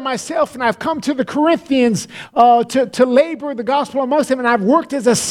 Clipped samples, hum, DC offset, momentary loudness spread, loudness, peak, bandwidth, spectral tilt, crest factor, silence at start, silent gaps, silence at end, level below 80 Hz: under 0.1%; none; under 0.1%; 7 LU; -16 LUFS; 0 dBFS; 15.5 kHz; -4.5 dB/octave; 16 dB; 0 s; none; 0 s; -56 dBFS